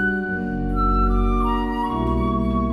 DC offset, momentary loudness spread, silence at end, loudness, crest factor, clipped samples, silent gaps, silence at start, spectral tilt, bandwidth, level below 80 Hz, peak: under 0.1%; 4 LU; 0 s; -22 LUFS; 12 dB; under 0.1%; none; 0 s; -8.5 dB/octave; 5 kHz; -24 dBFS; -8 dBFS